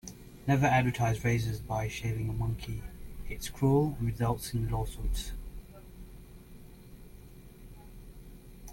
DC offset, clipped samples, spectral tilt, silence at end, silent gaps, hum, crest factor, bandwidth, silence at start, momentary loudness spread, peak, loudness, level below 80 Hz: under 0.1%; under 0.1%; -6.5 dB/octave; 0 s; none; none; 20 dB; 17 kHz; 0.05 s; 26 LU; -14 dBFS; -31 LUFS; -42 dBFS